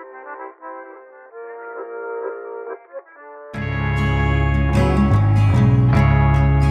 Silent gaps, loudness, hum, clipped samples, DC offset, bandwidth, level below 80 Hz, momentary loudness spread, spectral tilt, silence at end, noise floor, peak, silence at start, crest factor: none; -17 LUFS; none; under 0.1%; under 0.1%; 9 kHz; -26 dBFS; 21 LU; -8.5 dB/octave; 0 s; -41 dBFS; -6 dBFS; 0 s; 12 dB